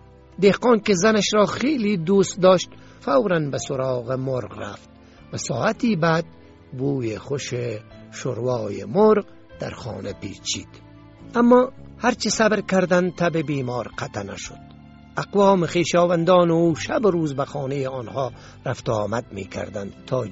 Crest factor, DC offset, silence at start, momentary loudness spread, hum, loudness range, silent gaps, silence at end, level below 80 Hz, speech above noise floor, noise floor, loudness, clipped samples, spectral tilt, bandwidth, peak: 20 dB; under 0.1%; 0.4 s; 16 LU; none; 5 LU; none; 0 s; -52 dBFS; 24 dB; -45 dBFS; -21 LUFS; under 0.1%; -5 dB/octave; 8 kHz; -2 dBFS